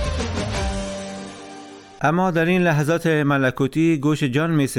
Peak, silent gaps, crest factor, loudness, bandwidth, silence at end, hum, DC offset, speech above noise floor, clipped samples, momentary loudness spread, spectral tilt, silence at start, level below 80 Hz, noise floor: -6 dBFS; none; 14 dB; -20 LUFS; 16 kHz; 0 s; none; under 0.1%; 21 dB; under 0.1%; 17 LU; -6 dB/octave; 0 s; -36 dBFS; -40 dBFS